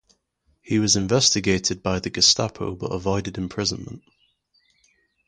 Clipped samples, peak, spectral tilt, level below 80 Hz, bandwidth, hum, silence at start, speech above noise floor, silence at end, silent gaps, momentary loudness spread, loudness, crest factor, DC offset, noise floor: under 0.1%; -2 dBFS; -3 dB/octave; -46 dBFS; 11 kHz; none; 0.65 s; 45 dB; 1.3 s; none; 13 LU; -21 LUFS; 22 dB; under 0.1%; -68 dBFS